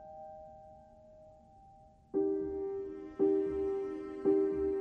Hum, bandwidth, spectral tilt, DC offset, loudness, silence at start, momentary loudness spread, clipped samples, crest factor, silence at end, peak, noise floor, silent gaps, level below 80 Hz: none; 3.3 kHz; -9.5 dB/octave; under 0.1%; -34 LUFS; 0 s; 19 LU; under 0.1%; 16 dB; 0 s; -20 dBFS; -60 dBFS; none; -60 dBFS